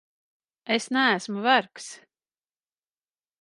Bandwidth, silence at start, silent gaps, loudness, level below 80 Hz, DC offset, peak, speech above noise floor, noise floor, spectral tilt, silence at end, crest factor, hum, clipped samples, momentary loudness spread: 11.5 kHz; 0.7 s; none; -23 LUFS; -84 dBFS; under 0.1%; -4 dBFS; over 65 dB; under -90 dBFS; -3 dB/octave; 1.45 s; 24 dB; none; under 0.1%; 19 LU